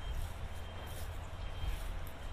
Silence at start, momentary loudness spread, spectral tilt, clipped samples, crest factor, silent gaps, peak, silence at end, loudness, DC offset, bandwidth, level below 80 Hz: 0 s; 3 LU; -5 dB/octave; under 0.1%; 14 dB; none; -28 dBFS; 0 s; -45 LUFS; under 0.1%; 15.5 kHz; -42 dBFS